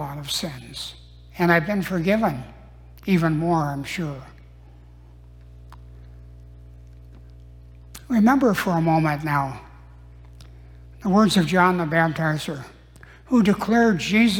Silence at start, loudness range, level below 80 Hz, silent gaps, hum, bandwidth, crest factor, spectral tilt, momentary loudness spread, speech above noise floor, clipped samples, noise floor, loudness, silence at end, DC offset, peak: 0 s; 7 LU; -46 dBFS; none; 60 Hz at -45 dBFS; 17.5 kHz; 18 dB; -6 dB/octave; 17 LU; 26 dB; under 0.1%; -47 dBFS; -21 LUFS; 0 s; under 0.1%; -4 dBFS